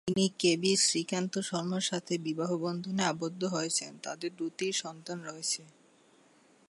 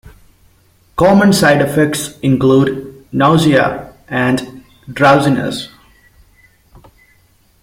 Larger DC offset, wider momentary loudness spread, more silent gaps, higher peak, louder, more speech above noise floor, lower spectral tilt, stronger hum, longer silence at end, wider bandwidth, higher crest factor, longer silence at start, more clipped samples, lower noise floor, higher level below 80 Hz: neither; second, 12 LU vs 17 LU; neither; second, -14 dBFS vs 0 dBFS; second, -32 LUFS vs -12 LUFS; second, 31 dB vs 41 dB; second, -3.5 dB/octave vs -5.5 dB/octave; neither; second, 1 s vs 1.95 s; second, 11.5 kHz vs 16.5 kHz; first, 20 dB vs 14 dB; second, 0.05 s vs 0.95 s; neither; first, -63 dBFS vs -52 dBFS; second, -74 dBFS vs -44 dBFS